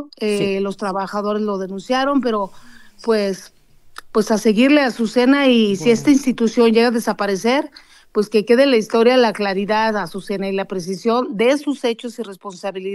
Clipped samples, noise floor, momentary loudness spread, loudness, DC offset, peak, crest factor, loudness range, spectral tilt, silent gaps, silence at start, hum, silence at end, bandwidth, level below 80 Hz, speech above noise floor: under 0.1%; -41 dBFS; 12 LU; -17 LUFS; under 0.1%; -2 dBFS; 16 dB; 6 LU; -5 dB/octave; none; 0 s; none; 0 s; 12.5 kHz; -54 dBFS; 24 dB